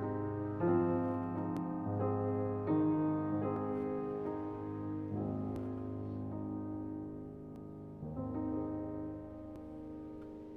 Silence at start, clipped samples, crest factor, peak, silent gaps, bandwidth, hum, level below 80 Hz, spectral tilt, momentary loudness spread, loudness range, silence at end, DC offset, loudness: 0 s; under 0.1%; 16 dB; -20 dBFS; none; 4.5 kHz; none; -60 dBFS; -11 dB/octave; 15 LU; 8 LU; 0 s; under 0.1%; -38 LUFS